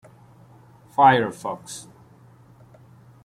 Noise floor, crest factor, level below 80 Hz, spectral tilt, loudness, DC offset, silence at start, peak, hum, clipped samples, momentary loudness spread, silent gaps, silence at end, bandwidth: -51 dBFS; 22 dB; -64 dBFS; -5 dB/octave; -20 LUFS; under 0.1%; 1 s; -4 dBFS; none; under 0.1%; 21 LU; none; 1.45 s; 14.5 kHz